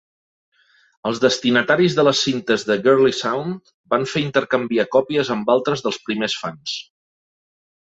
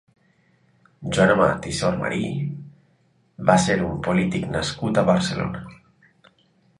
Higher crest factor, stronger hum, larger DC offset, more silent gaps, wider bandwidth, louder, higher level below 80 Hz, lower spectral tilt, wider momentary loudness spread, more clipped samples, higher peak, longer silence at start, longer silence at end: about the same, 18 dB vs 22 dB; neither; neither; first, 3.74-3.84 s vs none; second, 8 kHz vs 11.5 kHz; first, -19 LUFS vs -22 LUFS; second, -62 dBFS vs -48 dBFS; about the same, -4.5 dB/octave vs -5.5 dB/octave; about the same, 11 LU vs 13 LU; neither; about the same, -2 dBFS vs -2 dBFS; about the same, 1.05 s vs 1 s; about the same, 1 s vs 1.05 s